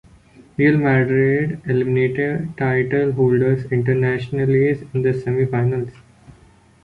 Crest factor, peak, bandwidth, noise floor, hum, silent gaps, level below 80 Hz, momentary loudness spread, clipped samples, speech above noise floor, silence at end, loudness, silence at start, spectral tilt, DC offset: 16 dB; -4 dBFS; 5 kHz; -50 dBFS; none; none; -50 dBFS; 6 LU; under 0.1%; 32 dB; 0.9 s; -19 LUFS; 0.6 s; -9.5 dB/octave; under 0.1%